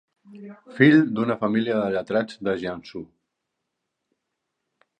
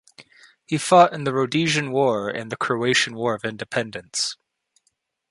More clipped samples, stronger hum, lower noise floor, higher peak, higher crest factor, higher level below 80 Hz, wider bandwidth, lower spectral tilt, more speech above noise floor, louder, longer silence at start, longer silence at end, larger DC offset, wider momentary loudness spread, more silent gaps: neither; neither; first, -81 dBFS vs -71 dBFS; about the same, -2 dBFS vs -2 dBFS; about the same, 22 dB vs 22 dB; about the same, -64 dBFS vs -64 dBFS; second, 8.8 kHz vs 11.5 kHz; first, -8 dB/octave vs -4 dB/octave; first, 58 dB vs 50 dB; about the same, -22 LUFS vs -21 LUFS; about the same, 0.3 s vs 0.2 s; first, 1.95 s vs 0.95 s; neither; first, 23 LU vs 13 LU; neither